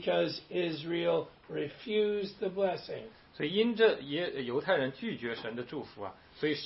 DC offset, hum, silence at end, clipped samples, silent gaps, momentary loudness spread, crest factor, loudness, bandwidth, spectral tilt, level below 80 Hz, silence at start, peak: under 0.1%; none; 0 s; under 0.1%; none; 14 LU; 20 dB; -33 LUFS; 5.8 kHz; -9 dB/octave; -70 dBFS; 0 s; -12 dBFS